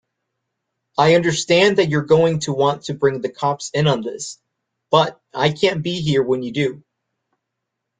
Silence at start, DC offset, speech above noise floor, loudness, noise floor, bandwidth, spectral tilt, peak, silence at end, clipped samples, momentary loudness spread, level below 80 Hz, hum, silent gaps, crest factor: 1 s; under 0.1%; 61 dB; -18 LUFS; -79 dBFS; 9.4 kHz; -5 dB/octave; -2 dBFS; 1.2 s; under 0.1%; 8 LU; -58 dBFS; none; none; 18 dB